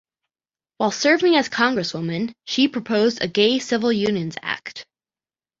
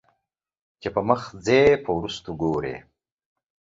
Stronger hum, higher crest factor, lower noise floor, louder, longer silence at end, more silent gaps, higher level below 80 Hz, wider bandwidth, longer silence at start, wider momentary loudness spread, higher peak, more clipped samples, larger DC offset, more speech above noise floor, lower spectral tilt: neither; about the same, 20 dB vs 22 dB; first, under -90 dBFS vs -80 dBFS; first, -20 LUFS vs -23 LUFS; second, 0.75 s vs 1 s; neither; second, -62 dBFS vs -52 dBFS; about the same, 7.8 kHz vs 7.8 kHz; about the same, 0.8 s vs 0.85 s; second, 10 LU vs 16 LU; about the same, -2 dBFS vs -4 dBFS; neither; neither; first, over 70 dB vs 57 dB; second, -4.5 dB/octave vs -6 dB/octave